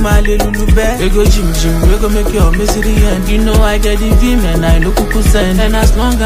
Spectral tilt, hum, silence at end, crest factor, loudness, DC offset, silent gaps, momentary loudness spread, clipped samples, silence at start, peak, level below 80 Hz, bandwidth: -5.5 dB/octave; none; 0 s; 8 dB; -12 LUFS; under 0.1%; none; 2 LU; under 0.1%; 0 s; 0 dBFS; -10 dBFS; 16 kHz